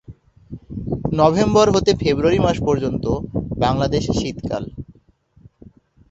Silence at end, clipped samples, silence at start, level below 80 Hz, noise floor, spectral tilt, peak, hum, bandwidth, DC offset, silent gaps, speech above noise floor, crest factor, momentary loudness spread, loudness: 1.3 s; under 0.1%; 0.1 s; -36 dBFS; -54 dBFS; -6 dB/octave; -2 dBFS; none; 8 kHz; under 0.1%; none; 37 dB; 18 dB; 18 LU; -19 LUFS